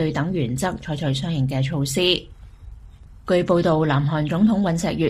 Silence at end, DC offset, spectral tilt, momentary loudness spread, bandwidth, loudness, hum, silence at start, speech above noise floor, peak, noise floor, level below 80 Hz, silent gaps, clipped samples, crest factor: 0 s; under 0.1%; -6 dB/octave; 6 LU; 15 kHz; -21 LUFS; none; 0 s; 22 dB; -4 dBFS; -43 dBFS; -44 dBFS; none; under 0.1%; 16 dB